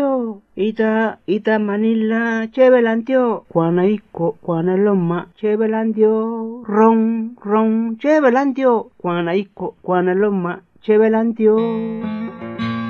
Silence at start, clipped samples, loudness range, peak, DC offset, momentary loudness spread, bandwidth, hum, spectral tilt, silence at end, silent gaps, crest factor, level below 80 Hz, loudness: 0 s; under 0.1%; 2 LU; -2 dBFS; under 0.1%; 10 LU; 6.8 kHz; none; -8.5 dB/octave; 0 s; none; 14 dB; -62 dBFS; -17 LUFS